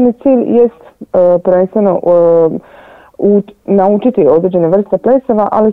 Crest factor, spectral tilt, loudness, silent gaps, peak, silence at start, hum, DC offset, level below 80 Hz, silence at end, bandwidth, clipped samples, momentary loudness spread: 10 dB; -11 dB/octave; -10 LUFS; none; 0 dBFS; 0 s; none; 0.4%; -48 dBFS; 0 s; 3.8 kHz; under 0.1%; 5 LU